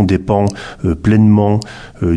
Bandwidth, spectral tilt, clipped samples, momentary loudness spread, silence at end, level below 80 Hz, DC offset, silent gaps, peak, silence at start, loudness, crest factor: 10.5 kHz; -8 dB/octave; under 0.1%; 11 LU; 0 s; -34 dBFS; under 0.1%; none; 0 dBFS; 0 s; -14 LUFS; 12 dB